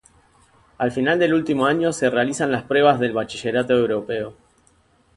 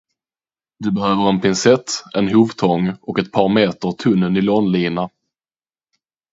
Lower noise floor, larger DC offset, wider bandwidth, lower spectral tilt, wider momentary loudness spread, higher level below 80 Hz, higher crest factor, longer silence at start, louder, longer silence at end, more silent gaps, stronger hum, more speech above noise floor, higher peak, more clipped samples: second, -59 dBFS vs under -90 dBFS; neither; first, 11.5 kHz vs 8 kHz; about the same, -5 dB/octave vs -5.5 dB/octave; about the same, 8 LU vs 8 LU; about the same, -56 dBFS vs -52 dBFS; about the same, 20 dB vs 18 dB; about the same, 0.8 s vs 0.8 s; second, -20 LUFS vs -17 LUFS; second, 0.85 s vs 1.25 s; neither; neither; second, 39 dB vs over 74 dB; about the same, -2 dBFS vs 0 dBFS; neither